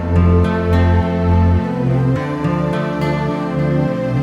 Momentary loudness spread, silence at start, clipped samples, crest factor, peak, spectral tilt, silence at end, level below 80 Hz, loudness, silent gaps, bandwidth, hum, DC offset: 5 LU; 0 s; under 0.1%; 12 dB; -2 dBFS; -9 dB/octave; 0 s; -28 dBFS; -16 LUFS; none; 6.8 kHz; none; under 0.1%